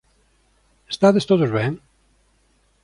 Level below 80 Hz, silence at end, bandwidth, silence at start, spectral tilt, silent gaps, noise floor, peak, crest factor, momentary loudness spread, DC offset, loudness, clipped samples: -58 dBFS; 1.05 s; 11 kHz; 0.9 s; -6.5 dB/octave; none; -62 dBFS; -4 dBFS; 18 dB; 15 LU; under 0.1%; -19 LUFS; under 0.1%